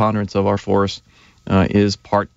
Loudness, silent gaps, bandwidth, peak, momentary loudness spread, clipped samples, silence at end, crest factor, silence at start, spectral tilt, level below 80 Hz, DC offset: -18 LUFS; none; 8 kHz; -4 dBFS; 5 LU; under 0.1%; 0.1 s; 14 dB; 0 s; -6.5 dB/octave; -44 dBFS; under 0.1%